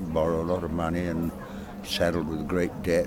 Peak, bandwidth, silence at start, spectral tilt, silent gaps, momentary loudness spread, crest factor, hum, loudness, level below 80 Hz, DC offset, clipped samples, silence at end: -10 dBFS; 17.5 kHz; 0 s; -6 dB/octave; none; 9 LU; 16 dB; none; -28 LUFS; -46 dBFS; under 0.1%; under 0.1%; 0 s